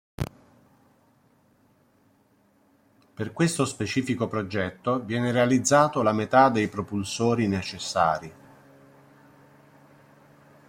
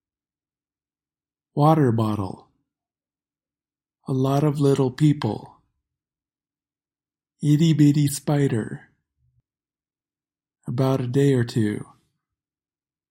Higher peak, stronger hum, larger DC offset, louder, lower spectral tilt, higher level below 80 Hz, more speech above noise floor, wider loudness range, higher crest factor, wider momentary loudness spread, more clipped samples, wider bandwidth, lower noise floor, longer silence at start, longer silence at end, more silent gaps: about the same, -4 dBFS vs -4 dBFS; neither; neither; second, -25 LUFS vs -21 LUFS; second, -5 dB/octave vs -7.5 dB/octave; about the same, -58 dBFS vs -62 dBFS; second, 39 dB vs over 70 dB; first, 10 LU vs 3 LU; about the same, 22 dB vs 20 dB; about the same, 14 LU vs 16 LU; neither; about the same, 16.5 kHz vs 16.5 kHz; second, -63 dBFS vs under -90 dBFS; second, 0.2 s vs 1.55 s; first, 2.35 s vs 1.25 s; neither